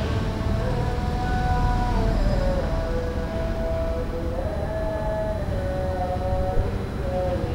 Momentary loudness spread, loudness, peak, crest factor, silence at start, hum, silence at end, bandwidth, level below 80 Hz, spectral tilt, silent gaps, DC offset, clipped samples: 4 LU; -26 LUFS; -10 dBFS; 14 dB; 0 s; none; 0 s; 15 kHz; -28 dBFS; -7.5 dB/octave; none; under 0.1%; under 0.1%